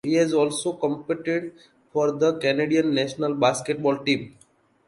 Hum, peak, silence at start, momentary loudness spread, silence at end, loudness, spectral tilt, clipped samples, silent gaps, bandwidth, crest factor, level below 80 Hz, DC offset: none; -6 dBFS; 0.05 s; 7 LU; 0.6 s; -24 LUFS; -5 dB/octave; under 0.1%; none; 11.5 kHz; 18 dB; -66 dBFS; under 0.1%